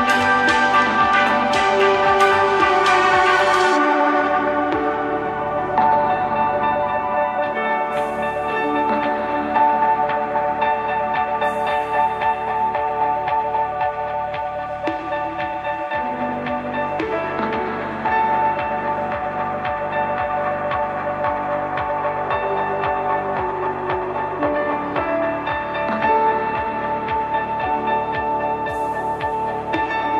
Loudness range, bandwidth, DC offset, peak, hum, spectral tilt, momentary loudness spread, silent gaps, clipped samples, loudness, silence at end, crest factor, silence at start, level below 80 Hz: 7 LU; 13 kHz; under 0.1%; -2 dBFS; none; -5 dB/octave; 8 LU; none; under 0.1%; -20 LUFS; 0 s; 16 dB; 0 s; -48 dBFS